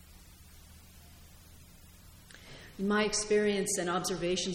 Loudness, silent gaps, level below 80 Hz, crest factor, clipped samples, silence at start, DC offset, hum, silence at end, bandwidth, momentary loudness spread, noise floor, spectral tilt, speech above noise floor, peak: -30 LUFS; none; -56 dBFS; 16 dB; under 0.1%; 0.1 s; under 0.1%; none; 0 s; 17 kHz; 22 LU; -55 dBFS; -3.5 dB/octave; 24 dB; -18 dBFS